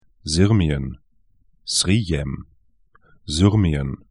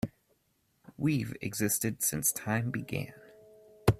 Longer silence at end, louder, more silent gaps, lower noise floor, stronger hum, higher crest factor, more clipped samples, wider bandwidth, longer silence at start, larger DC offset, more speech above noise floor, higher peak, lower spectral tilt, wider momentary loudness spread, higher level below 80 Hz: first, 0.15 s vs 0 s; first, -20 LUFS vs -31 LUFS; neither; second, -62 dBFS vs -74 dBFS; neither; about the same, 20 dB vs 24 dB; neither; second, 12 kHz vs 16 kHz; first, 0.25 s vs 0.05 s; first, 0.1% vs under 0.1%; about the same, 42 dB vs 42 dB; first, -2 dBFS vs -10 dBFS; about the same, -5 dB/octave vs -4.5 dB/octave; first, 16 LU vs 10 LU; first, -36 dBFS vs -54 dBFS